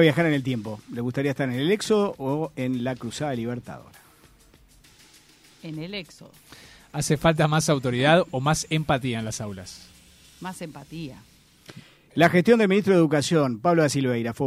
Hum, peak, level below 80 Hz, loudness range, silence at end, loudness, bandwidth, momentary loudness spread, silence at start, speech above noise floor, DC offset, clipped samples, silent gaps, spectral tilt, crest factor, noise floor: none; -4 dBFS; -54 dBFS; 14 LU; 0 s; -23 LUFS; 15.5 kHz; 18 LU; 0 s; 32 dB; under 0.1%; under 0.1%; none; -5.5 dB/octave; 20 dB; -55 dBFS